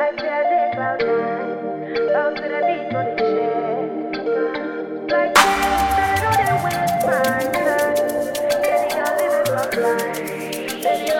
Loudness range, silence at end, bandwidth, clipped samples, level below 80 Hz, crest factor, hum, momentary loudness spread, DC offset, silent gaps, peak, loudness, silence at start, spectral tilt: 4 LU; 0 s; 18 kHz; under 0.1%; -46 dBFS; 20 dB; none; 7 LU; under 0.1%; none; 0 dBFS; -20 LUFS; 0 s; -4 dB/octave